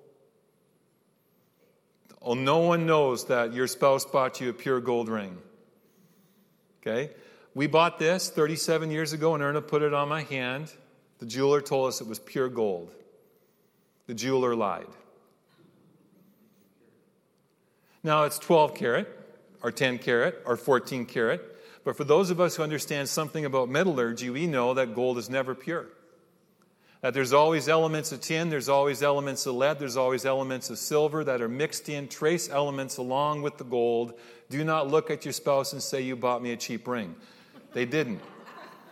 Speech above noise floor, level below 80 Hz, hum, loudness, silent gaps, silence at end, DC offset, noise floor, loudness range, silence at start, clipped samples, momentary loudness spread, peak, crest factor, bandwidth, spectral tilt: 41 dB; -78 dBFS; none; -27 LUFS; none; 0 s; under 0.1%; -68 dBFS; 6 LU; 2.2 s; under 0.1%; 12 LU; -10 dBFS; 20 dB; 16 kHz; -4.5 dB/octave